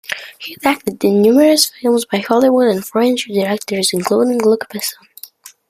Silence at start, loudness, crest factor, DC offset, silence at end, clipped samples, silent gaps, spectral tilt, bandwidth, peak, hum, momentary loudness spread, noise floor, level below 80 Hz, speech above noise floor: 0.1 s; -14 LUFS; 16 dB; under 0.1%; 0.2 s; under 0.1%; none; -4 dB/octave; 15.5 kHz; 0 dBFS; none; 13 LU; -39 dBFS; -60 dBFS; 25 dB